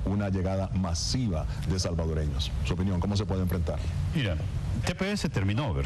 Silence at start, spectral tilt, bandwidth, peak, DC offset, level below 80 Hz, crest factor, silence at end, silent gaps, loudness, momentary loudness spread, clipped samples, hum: 0 s; -6 dB/octave; 12.5 kHz; -14 dBFS; under 0.1%; -36 dBFS; 14 dB; 0 s; none; -29 LUFS; 3 LU; under 0.1%; none